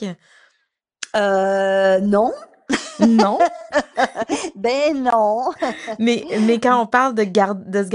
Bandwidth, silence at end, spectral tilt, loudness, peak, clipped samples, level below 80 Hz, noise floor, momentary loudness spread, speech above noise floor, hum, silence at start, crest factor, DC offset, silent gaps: 11 kHz; 0 s; -5 dB/octave; -18 LUFS; -2 dBFS; under 0.1%; -58 dBFS; -70 dBFS; 9 LU; 52 dB; none; 0 s; 18 dB; under 0.1%; none